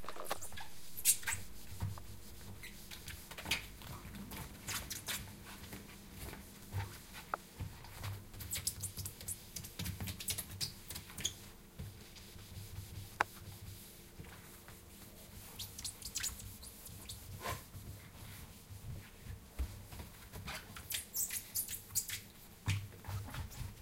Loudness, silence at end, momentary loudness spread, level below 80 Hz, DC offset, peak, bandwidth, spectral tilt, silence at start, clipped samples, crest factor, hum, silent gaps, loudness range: -43 LUFS; 0 s; 15 LU; -56 dBFS; under 0.1%; -12 dBFS; 17 kHz; -2 dB/octave; 0 s; under 0.1%; 34 dB; none; none; 7 LU